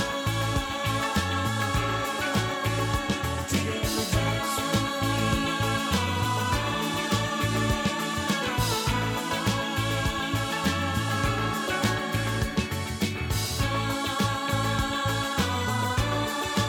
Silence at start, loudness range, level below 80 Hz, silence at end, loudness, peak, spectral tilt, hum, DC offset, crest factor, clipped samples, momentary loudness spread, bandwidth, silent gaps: 0 s; 1 LU; -40 dBFS; 0 s; -27 LUFS; -12 dBFS; -4.5 dB/octave; none; under 0.1%; 16 dB; under 0.1%; 2 LU; 18.5 kHz; none